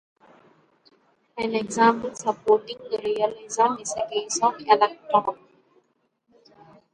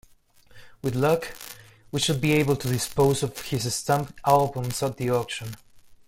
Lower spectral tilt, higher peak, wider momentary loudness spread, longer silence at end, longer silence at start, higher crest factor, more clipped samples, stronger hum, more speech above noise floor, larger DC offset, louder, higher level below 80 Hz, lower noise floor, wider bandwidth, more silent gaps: second, -3 dB/octave vs -5 dB/octave; about the same, -4 dBFS vs -6 dBFS; second, 10 LU vs 15 LU; first, 1.6 s vs 0.15 s; first, 1.35 s vs 0.55 s; about the same, 22 dB vs 20 dB; neither; neither; first, 47 dB vs 31 dB; neither; about the same, -23 LUFS vs -25 LUFS; second, -68 dBFS vs -52 dBFS; first, -70 dBFS vs -55 dBFS; second, 10.5 kHz vs 16.5 kHz; neither